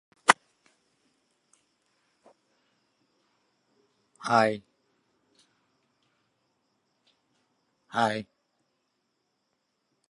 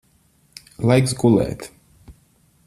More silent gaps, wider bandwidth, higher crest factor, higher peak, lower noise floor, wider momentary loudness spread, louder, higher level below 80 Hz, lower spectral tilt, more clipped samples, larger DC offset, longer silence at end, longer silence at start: neither; second, 11.5 kHz vs 14 kHz; first, 34 dB vs 18 dB; about the same, 0 dBFS vs -2 dBFS; first, -78 dBFS vs -59 dBFS; second, 16 LU vs 22 LU; second, -27 LUFS vs -18 LUFS; second, -80 dBFS vs -48 dBFS; second, -3 dB/octave vs -6.5 dB/octave; neither; neither; first, 1.9 s vs 0.55 s; second, 0.3 s vs 0.8 s